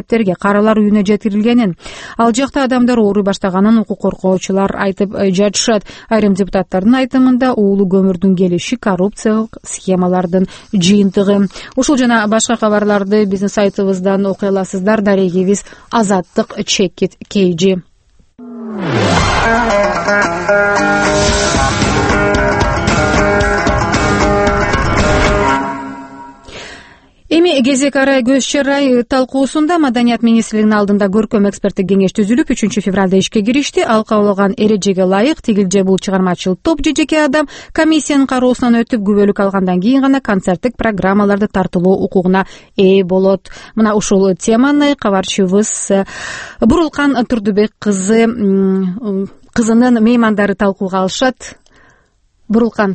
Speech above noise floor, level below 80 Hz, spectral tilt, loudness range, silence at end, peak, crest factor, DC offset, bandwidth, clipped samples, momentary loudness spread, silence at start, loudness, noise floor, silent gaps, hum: 42 dB; -30 dBFS; -5 dB/octave; 2 LU; 0 s; 0 dBFS; 12 dB; under 0.1%; 8.8 kHz; under 0.1%; 6 LU; 0.1 s; -12 LUFS; -54 dBFS; none; none